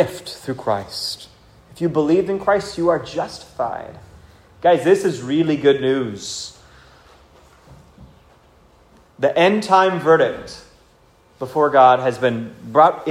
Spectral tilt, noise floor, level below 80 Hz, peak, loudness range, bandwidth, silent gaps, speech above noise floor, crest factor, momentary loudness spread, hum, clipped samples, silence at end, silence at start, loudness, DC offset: -5.5 dB/octave; -53 dBFS; -54 dBFS; 0 dBFS; 7 LU; 16 kHz; none; 36 dB; 18 dB; 15 LU; none; under 0.1%; 0 s; 0 s; -18 LUFS; under 0.1%